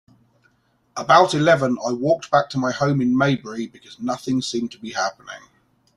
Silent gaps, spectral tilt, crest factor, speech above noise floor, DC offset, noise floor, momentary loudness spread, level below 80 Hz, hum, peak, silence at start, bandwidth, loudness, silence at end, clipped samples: none; -5.5 dB/octave; 20 dB; 43 dB; under 0.1%; -63 dBFS; 17 LU; -60 dBFS; none; 0 dBFS; 0.95 s; 12 kHz; -20 LUFS; 0.6 s; under 0.1%